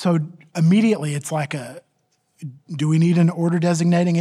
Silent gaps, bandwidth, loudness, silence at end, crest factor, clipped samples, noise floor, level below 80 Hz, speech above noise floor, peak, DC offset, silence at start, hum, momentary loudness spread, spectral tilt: none; 12 kHz; -19 LUFS; 0 s; 12 dB; under 0.1%; -68 dBFS; -70 dBFS; 49 dB; -6 dBFS; under 0.1%; 0 s; none; 19 LU; -7 dB/octave